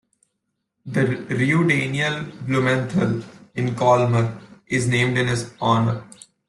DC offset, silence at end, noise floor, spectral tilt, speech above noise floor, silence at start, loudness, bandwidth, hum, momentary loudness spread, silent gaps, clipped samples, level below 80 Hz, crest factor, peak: under 0.1%; 0.45 s; -77 dBFS; -6 dB/octave; 56 dB; 0.85 s; -21 LUFS; 11.5 kHz; none; 9 LU; none; under 0.1%; -54 dBFS; 16 dB; -4 dBFS